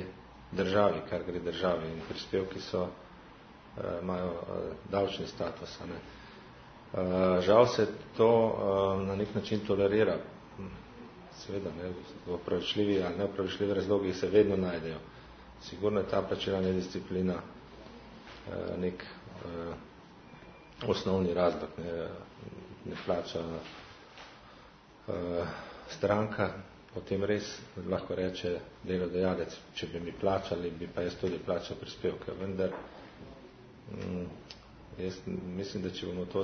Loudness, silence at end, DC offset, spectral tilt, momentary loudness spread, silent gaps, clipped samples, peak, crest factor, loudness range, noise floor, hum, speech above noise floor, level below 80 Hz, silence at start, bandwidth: -33 LUFS; 0 s; under 0.1%; -5 dB/octave; 22 LU; none; under 0.1%; -8 dBFS; 24 dB; 11 LU; -56 dBFS; none; 23 dB; -60 dBFS; 0 s; 6.4 kHz